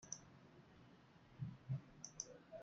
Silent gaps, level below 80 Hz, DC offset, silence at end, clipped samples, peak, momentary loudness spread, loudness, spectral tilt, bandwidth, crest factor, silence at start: none; -78 dBFS; under 0.1%; 0 s; under 0.1%; -30 dBFS; 17 LU; -52 LUFS; -4.5 dB/octave; 8.6 kHz; 24 dB; 0 s